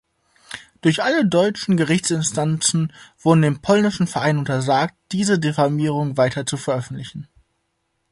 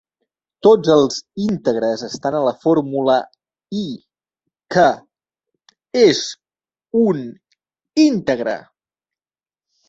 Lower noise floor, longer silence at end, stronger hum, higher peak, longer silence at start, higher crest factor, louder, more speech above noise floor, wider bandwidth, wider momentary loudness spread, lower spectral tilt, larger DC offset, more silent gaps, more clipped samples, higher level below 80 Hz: second, -72 dBFS vs under -90 dBFS; second, 0.9 s vs 1.3 s; neither; about the same, -2 dBFS vs -2 dBFS; second, 0.5 s vs 0.65 s; about the same, 18 dB vs 18 dB; about the same, -19 LUFS vs -17 LUFS; second, 52 dB vs over 74 dB; first, 11.5 kHz vs 8 kHz; second, 11 LU vs 15 LU; about the same, -5 dB/octave vs -5 dB/octave; neither; neither; neither; about the same, -56 dBFS vs -60 dBFS